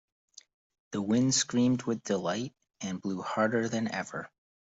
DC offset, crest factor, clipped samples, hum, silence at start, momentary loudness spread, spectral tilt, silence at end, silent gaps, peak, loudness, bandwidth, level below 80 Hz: under 0.1%; 18 dB; under 0.1%; none; 0.9 s; 14 LU; -4 dB/octave; 0.4 s; none; -14 dBFS; -30 LUFS; 8.2 kHz; -72 dBFS